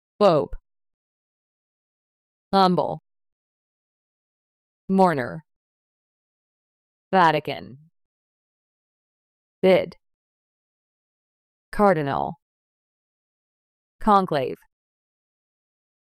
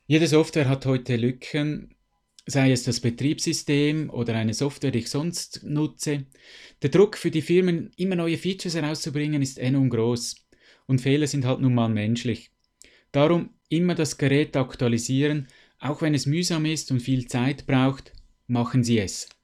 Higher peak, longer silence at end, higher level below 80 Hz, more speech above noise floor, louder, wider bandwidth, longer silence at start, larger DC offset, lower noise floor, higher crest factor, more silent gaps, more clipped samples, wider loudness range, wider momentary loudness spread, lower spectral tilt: about the same, -6 dBFS vs -6 dBFS; first, 1.55 s vs 0.2 s; first, -50 dBFS vs -56 dBFS; first, over 70 dB vs 36 dB; first, -21 LUFS vs -24 LUFS; about the same, 13 kHz vs 13.5 kHz; about the same, 0.2 s vs 0.1 s; neither; first, under -90 dBFS vs -59 dBFS; about the same, 20 dB vs 18 dB; first, 0.94-2.51 s, 3.32-4.88 s, 5.56-7.11 s, 8.05-9.62 s, 10.14-11.72 s, 12.42-13.99 s vs none; neither; about the same, 3 LU vs 2 LU; first, 16 LU vs 8 LU; first, -7 dB/octave vs -5.5 dB/octave